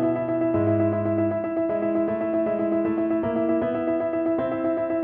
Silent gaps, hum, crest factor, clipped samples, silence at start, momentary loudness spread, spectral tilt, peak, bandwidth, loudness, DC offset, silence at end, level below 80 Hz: none; none; 12 dB; under 0.1%; 0 s; 3 LU; -12 dB/octave; -10 dBFS; 3.7 kHz; -24 LUFS; under 0.1%; 0 s; -58 dBFS